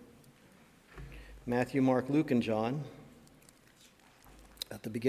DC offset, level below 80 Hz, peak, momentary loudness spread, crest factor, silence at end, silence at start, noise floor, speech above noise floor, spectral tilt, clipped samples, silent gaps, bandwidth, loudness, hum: under 0.1%; -60 dBFS; -16 dBFS; 22 LU; 20 dB; 0 s; 0 s; -62 dBFS; 31 dB; -6.5 dB/octave; under 0.1%; none; 16 kHz; -32 LUFS; none